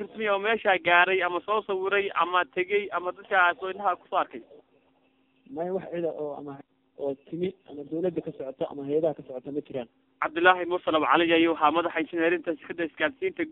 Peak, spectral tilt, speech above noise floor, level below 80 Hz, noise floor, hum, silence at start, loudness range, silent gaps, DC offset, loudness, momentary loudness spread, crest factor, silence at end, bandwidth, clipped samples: -4 dBFS; -7 dB/octave; 40 dB; -70 dBFS; -67 dBFS; none; 0 s; 10 LU; none; under 0.1%; -26 LUFS; 14 LU; 24 dB; 0 s; 4.1 kHz; under 0.1%